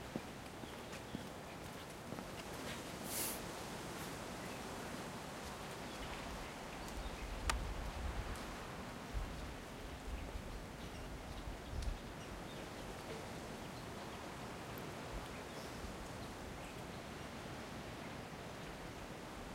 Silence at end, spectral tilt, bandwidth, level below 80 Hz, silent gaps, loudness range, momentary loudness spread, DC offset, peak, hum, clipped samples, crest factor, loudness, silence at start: 0 s; -4 dB/octave; 16 kHz; -52 dBFS; none; 3 LU; 5 LU; under 0.1%; -16 dBFS; none; under 0.1%; 30 dB; -47 LUFS; 0 s